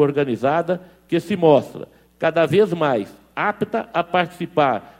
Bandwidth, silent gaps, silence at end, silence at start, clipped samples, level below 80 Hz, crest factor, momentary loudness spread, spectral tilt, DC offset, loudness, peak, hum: 15.5 kHz; none; 0.15 s; 0 s; under 0.1%; -60 dBFS; 18 dB; 9 LU; -7 dB/octave; under 0.1%; -20 LUFS; -2 dBFS; none